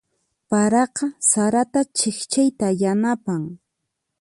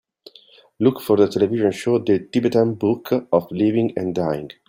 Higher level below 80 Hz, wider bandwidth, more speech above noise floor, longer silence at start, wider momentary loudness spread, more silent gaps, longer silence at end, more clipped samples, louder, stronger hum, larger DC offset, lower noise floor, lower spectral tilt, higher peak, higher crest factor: about the same, -62 dBFS vs -60 dBFS; second, 11.5 kHz vs 16.5 kHz; first, 58 dB vs 32 dB; second, 0.5 s vs 0.8 s; about the same, 7 LU vs 5 LU; neither; first, 0.65 s vs 0.2 s; neither; about the same, -20 LUFS vs -20 LUFS; neither; neither; first, -78 dBFS vs -51 dBFS; second, -4 dB/octave vs -7.5 dB/octave; about the same, -4 dBFS vs -2 dBFS; about the same, 16 dB vs 18 dB